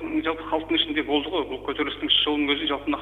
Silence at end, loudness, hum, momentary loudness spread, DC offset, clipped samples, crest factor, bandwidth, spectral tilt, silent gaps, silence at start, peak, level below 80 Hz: 0 s; -24 LUFS; 50 Hz at -50 dBFS; 8 LU; under 0.1%; under 0.1%; 18 dB; 4.6 kHz; -5.5 dB/octave; none; 0 s; -6 dBFS; -50 dBFS